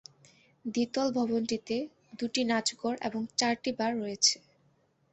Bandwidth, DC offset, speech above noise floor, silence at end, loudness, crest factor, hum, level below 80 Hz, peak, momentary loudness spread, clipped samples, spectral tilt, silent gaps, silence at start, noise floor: 8.6 kHz; under 0.1%; 39 dB; 0.75 s; -30 LUFS; 22 dB; none; -72 dBFS; -10 dBFS; 10 LU; under 0.1%; -2.5 dB/octave; none; 0.65 s; -69 dBFS